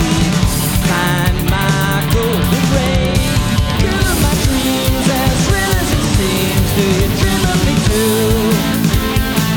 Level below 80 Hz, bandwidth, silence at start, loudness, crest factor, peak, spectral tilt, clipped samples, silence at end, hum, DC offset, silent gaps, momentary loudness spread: -22 dBFS; over 20 kHz; 0 s; -14 LUFS; 12 dB; 0 dBFS; -5 dB/octave; under 0.1%; 0 s; none; under 0.1%; none; 1 LU